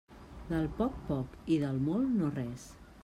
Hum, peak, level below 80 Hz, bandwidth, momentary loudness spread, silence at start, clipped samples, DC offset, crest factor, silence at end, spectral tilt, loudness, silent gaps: none; -18 dBFS; -52 dBFS; 13.5 kHz; 18 LU; 0.1 s; under 0.1%; under 0.1%; 16 dB; 0 s; -8 dB/octave; -33 LUFS; none